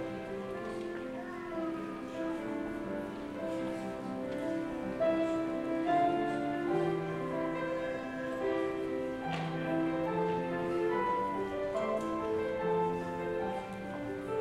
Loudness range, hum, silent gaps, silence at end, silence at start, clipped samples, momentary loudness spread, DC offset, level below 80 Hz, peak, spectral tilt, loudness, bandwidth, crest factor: 6 LU; none; none; 0 s; 0 s; under 0.1%; 8 LU; under 0.1%; -62 dBFS; -20 dBFS; -7 dB/octave; -35 LUFS; 13 kHz; 16 dB